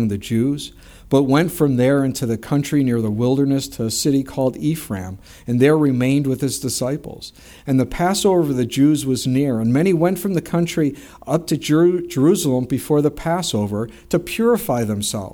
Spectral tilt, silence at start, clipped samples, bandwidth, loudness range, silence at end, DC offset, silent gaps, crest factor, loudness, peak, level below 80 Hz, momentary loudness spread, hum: -6 dB/octave; 0 s; under 0.1%; over 20 kHz; 2 LU; 0 s; under 0.1%; none; 16 dB; -19 LUFS; -2 dBFS; -46 dBFS; 8 LU; none